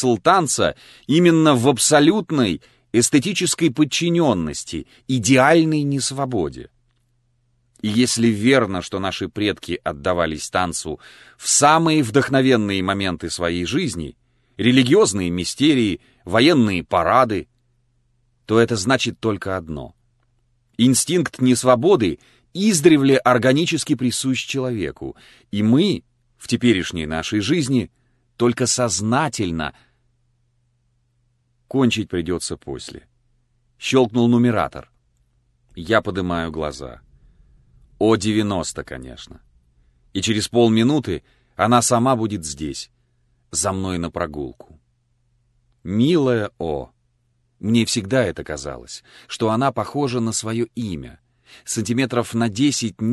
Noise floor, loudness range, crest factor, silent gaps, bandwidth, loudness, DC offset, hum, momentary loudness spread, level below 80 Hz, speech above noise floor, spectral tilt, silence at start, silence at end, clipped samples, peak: -65 dBFS; 7 LU; 20 dB; none; 12.5 kHz; -19 LUFS; under 0.1%; none; 16 LU; -46 dBFS; 46 dB; -4.5 dB/octave; 0 s; 0 s; under 0.1%; 0 dBFS